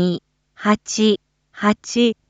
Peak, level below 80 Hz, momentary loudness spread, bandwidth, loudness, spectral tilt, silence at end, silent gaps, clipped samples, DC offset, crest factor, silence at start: -4 dBFS; -58 dBFS; 7 LU; 8 kHz; -20 LUFS; -4.5 dB/octave; 0.15 s; none; under 0.1%; under 0.1%; 16 dB; 0 s